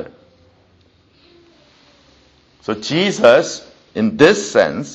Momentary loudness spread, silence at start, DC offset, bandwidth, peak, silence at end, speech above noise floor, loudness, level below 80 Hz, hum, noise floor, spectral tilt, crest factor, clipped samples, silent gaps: 19 LU; 0 s; under 0.1%; 8.4 kHz; 0 dBFS; 0 s; 40 dB; -14 LUFS; -56 dBFS; none; -54 dBFS; -4.5 dB/octave; 18 dB; under 0.1%; none